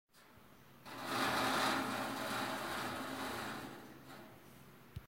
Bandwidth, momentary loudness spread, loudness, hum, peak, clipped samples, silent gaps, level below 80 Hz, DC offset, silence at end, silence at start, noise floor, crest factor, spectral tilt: 16 kHz; 23 LU; -38 LUFS; none; -22 dBFS; under 0.1%; none; -68 dBFS; under 0.1%; 0 s; 0.15 s; -63 dBFS; 20 dB; -3 dB/octave